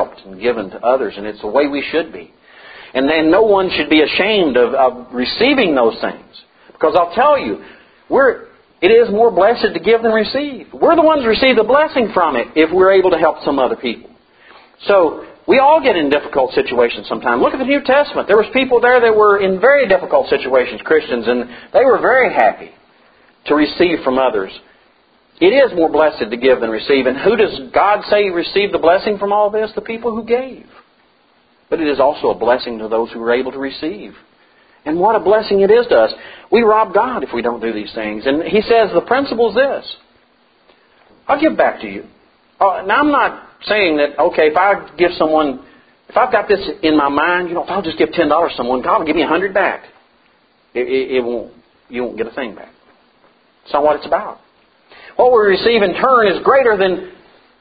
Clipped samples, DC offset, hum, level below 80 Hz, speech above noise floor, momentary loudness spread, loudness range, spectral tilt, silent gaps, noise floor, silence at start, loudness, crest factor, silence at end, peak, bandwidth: under 0.1%; under 0.1%; none; -48 dBFS; 41 dB; 12 LU; 6 LU; -8.5 dB/octave; none; -55 dBFS; 0 s; -14 LUFS; 14 dB; 0.5 s; 0 dBFS; 5 kHz